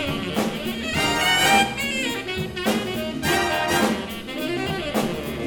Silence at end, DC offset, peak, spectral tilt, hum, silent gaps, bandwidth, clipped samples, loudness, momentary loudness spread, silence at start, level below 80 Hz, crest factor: 0 s; under 0.1%; -4 dBFS; -3.5 dB/octave; none; none; over 20 kHz; under 0.1%; -22 LUFS; 10 LU; 0 s; -44 dBFS; 18 dB